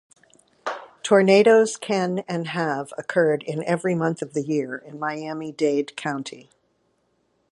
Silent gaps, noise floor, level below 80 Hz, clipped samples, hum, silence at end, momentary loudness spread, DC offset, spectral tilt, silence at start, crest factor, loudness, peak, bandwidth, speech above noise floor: none; -68 dBFS; -74 dBFS; under 0.1%; none; 1.1 s; 16 LU; under 0.1%; -5.5 dB/octave; 0.65 s; 20 dB; -23 LUFS; -4 dBFS; 11.5 kHz; 47 dB